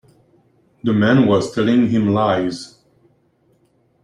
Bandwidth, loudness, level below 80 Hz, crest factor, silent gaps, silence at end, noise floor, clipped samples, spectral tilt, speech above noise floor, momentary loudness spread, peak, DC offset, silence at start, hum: 10.5 kHz; -17 LUFS; -56 dBFS; 16 dB; none; 1.4 s; -60 dBFS; under 0.1%; -7 dB/octave; 44 dB; 12 LU; -4 dBFS; under 0.1%; 0.85 s; none